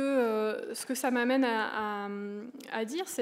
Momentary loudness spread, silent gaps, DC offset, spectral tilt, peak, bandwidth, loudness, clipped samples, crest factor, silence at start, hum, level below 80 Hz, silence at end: 11 LU; none; under 0.1%; -3.5 dB/octave; -16 dBFS; 16 kHz; -31 LUFS; under 0.1%; 14 dB; 0 s; none; -82 dBFS; 0 s